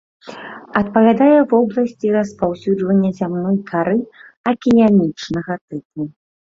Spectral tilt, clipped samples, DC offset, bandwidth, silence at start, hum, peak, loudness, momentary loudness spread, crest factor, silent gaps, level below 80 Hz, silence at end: -8 dB/octave; under 0.1%; under 0.1%; 7.6 kHz; 0.25 s; none; -2 dBFS; -16 LUFS; 17 LU; 14 dB; 4.37-4.44 s, 5.61-5.68 s, 5.85-5.90 s; -54 dBFS; 0.4 s